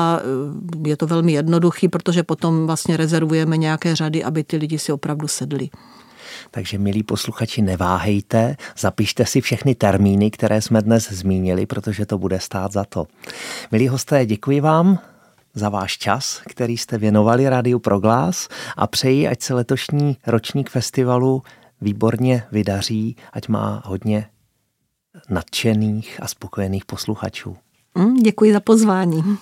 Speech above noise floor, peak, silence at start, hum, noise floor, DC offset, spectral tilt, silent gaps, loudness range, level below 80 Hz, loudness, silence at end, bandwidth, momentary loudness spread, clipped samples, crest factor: 53 dB; 0 dBFS; 0 s; none; -72 dBFS; under 0.1%; -6 dB/octave; none; 6 LU; -52 dBFS; -19 LUFS; 0.05 s; 16.5 kHz; 11 LU; under 0.1%; 18 dB